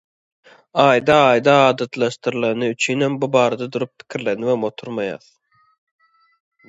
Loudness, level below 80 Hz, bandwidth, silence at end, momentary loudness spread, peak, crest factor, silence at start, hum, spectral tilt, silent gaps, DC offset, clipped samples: -18 LUFS; -60 dBFS; 8 kHz; 1.5 s; 13 LU; 0 dBFS; 20 dB; 0.75 s; none; -5 dB/octave; none; under 0.1%; under 0.1%